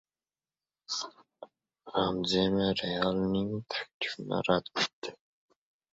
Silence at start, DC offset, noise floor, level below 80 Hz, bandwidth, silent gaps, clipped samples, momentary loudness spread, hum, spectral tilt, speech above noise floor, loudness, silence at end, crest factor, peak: 0.9 s; under 0.1%; under -90 dBFS; -60 dBFS; 8 kHz; 3.94-4.00 s, 4.93-5.02 s; under 0.1%; 9 LU; none; -5 dB/octave; over 59 dB; -31 LUFS; 0.8 s; 22 dB; -12 dBFS